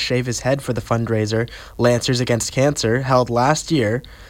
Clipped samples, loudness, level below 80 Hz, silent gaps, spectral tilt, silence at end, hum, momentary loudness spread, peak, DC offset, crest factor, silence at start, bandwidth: under 0.1%; -19 LUFS; -42 dBFS; none; -5 dB/octave; 0 s; none; 5 LU; -4 dBFS; under 0.1%; 16 dB; 0 s; 16.5 kHz